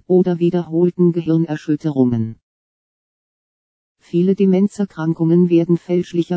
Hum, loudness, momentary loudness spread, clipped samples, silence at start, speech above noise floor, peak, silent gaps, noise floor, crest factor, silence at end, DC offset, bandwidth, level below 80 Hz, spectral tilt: none; -17 LUFS; 6 LU; under 0.1%; 0.1 s; over 74 dB; -2 dBFS; 2.43-3.95 s; under -90 dBFS; 14 dB; 0 s; under 0.1%; 8 kHz; -60 dBFS; -9.5 dB/octave